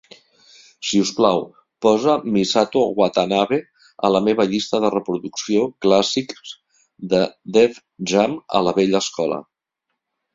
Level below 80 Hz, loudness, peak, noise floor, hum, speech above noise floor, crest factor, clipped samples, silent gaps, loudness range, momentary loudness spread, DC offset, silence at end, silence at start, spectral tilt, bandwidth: -60 dBFS; -19 LUFS; -2 dBFS; -78 dBFS; none; 60 dB; 18 dB; under 0.1%; none; 2 LU; 9 LU; under 0.1%; 0.9 s; 0.8 s; -4.5 dB/octave; 7.8 kHz